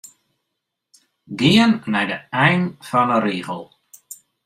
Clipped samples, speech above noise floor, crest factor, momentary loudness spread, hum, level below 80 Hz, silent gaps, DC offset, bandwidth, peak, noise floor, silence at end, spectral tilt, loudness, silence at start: under 0.1%; 61 dB; 20 dB; 21 LU; none; -58 dBFS; none; under 0.1%; 15.5 kHz; -2 dBFS; -79 dBFS; 0.3 s; -5.5 dB/octave; -18 LUFS; 1.3 s